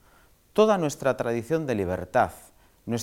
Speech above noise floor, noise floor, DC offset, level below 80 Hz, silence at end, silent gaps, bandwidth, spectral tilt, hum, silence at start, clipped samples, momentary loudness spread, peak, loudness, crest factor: 34 dB; -58 dBFS; under 0.1%; -58 dBFS; 0 s; none; 17 kHz; -5.5 dB/octave; none; 0.55 s; under 0.1%; 8 LU; -6 dBFS; -25 LUFS; 20 dB